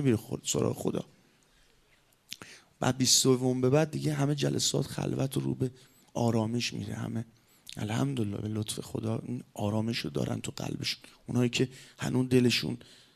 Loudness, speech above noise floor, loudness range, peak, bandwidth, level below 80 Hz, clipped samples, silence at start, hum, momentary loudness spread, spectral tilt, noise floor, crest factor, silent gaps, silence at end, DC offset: -30 LUFS; 36 dB; 6 LU; -10 dBFS; 14 kHz; -64 dBFS; under 0.1%; 0 s; none; 14 LU; -4.5 dB/octave; -66 dBFS; 22 dB; none; 0.4 s; under 0.1%